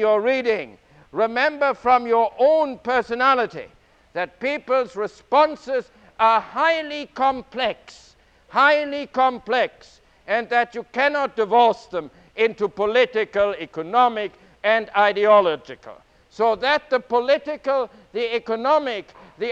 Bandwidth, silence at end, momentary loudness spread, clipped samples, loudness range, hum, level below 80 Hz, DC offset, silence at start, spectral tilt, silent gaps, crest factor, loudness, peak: 8.2 kHz; 0 s; 12 LU; under 0.1%; 2 LU; none; -60 dBFS; under 0.1%; 0 s; -4.5 dB/octave; none; 18 dB; -21 LUFS; -4 dBFS